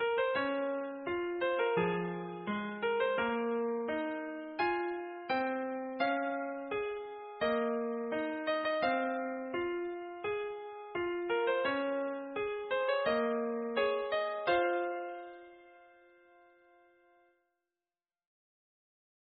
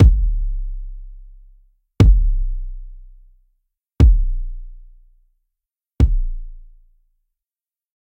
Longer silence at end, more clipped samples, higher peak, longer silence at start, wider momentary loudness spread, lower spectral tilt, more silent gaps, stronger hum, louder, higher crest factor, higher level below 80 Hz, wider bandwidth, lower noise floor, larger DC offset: first, 3.45 s vs 1.4 s; neither; second, -18 dBFS vs 0 dBFS; about the same, 0 s vs 0 s; second, 9 LU vs 23 LU; second, -3 dB/octave vs -9 dB/octave; neither; neither; second, -35 LUFS vs -19 LUFS; about the same, 16 dB vs 18 dB; second, -72 dBFS vs -20 dBFS; second, 4.8 kHz vs 6 kHz; about the same, under -90 dBFS vs under -90 dBFS; neither